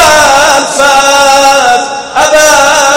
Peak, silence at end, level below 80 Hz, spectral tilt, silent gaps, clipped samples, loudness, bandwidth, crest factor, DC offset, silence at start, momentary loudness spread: 0 dBFS; 0 s; -36 dBFS; -0.5 dB/octave; none; 6%; -5 LUFS; over 20 kHz; 6 dB; under 0.1%; 0 s; 5 LU